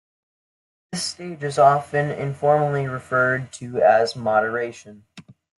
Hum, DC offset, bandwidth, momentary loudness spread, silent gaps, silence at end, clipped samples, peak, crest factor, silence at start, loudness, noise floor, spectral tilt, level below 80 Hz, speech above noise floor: none; under 0.1%; 12 kHz; 11 LU; none; 0.35 s; under 0.1%; -4 dBFS; 18 dB; 0.9 s; -21 LUFS; under -90 dBFS; -5 dB/octave; -66 dBFS; over 69 dB